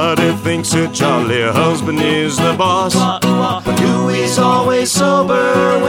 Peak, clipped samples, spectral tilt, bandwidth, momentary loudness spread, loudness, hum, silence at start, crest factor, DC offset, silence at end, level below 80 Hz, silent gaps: 0 dBFS; under 0.1%; -4.5 dB/octave; 18.5 kHz; 3 LU; -14 LUFS; none; 0 s; 14 dB; under 0.1%; 0 s; -46 dBFS; none